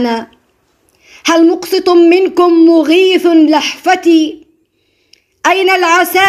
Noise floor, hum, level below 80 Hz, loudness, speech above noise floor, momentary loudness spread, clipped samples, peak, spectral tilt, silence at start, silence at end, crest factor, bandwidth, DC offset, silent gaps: -58 dBFS; none; -58 dBFS; -9 LUFS; 50 dB; 8 LU; under 0.1%; 0 dBFS; -2.5 dB/octave; 0 s; 0 s; 10 dB; 15.5 kHz; under 0.1%; none